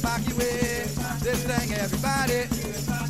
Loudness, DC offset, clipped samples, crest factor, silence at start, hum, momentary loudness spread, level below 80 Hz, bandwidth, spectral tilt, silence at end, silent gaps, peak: -26 LUFS; 0.4%; under 0.1%; 16 dB; 0 s; none; 4 LU; -38 dBFS; 16 kHz; -4.5 dB/octave; 0 s; none; -10 dBFS